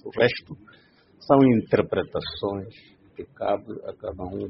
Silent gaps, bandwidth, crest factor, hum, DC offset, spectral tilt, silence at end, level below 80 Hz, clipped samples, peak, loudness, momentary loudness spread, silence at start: none; 5.8 kHz; 22 dB; none; under 0.1%; -5.5 dB/octave; 0 s; -54 dBFS; under 0.1%; -2 dBFS; -24 LUFS; 24 LU; 0.05 s